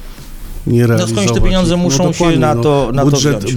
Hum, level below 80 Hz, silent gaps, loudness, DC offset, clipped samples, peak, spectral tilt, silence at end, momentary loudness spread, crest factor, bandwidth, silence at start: none; -22 dBFS; none; -12 LUFS; under 0.1%; under 0.1%; 0 dBFS; -5.5 dB/octave; 0 s; 2 LU; 12 dB; 18.5 kHz; 0 s